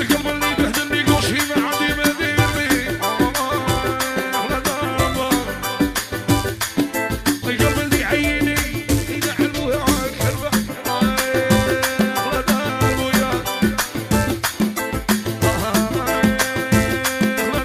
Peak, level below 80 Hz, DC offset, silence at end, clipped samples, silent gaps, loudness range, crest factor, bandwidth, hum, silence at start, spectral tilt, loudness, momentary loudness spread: -2 dBFS; -34 dBFS; under 0.1%; 0 s; under 0.1%; none; 2 LU; 18 dB; 15.5 kHz; none; 0 s; -4 dB/octave; -19 LUFS; 4 LU